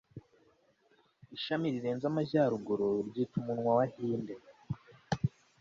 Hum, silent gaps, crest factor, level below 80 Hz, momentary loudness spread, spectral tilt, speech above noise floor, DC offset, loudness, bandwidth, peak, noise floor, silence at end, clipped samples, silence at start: none; none; 18 dB; -64 dBFS; 15 LU; -7.5 dB/octave; 38 dB; under 0.1%; -34 LUFS; 7.6 kHz; -16 dBFS; -70 dBFS; 0.35 s; under 0.1%; 0.15 s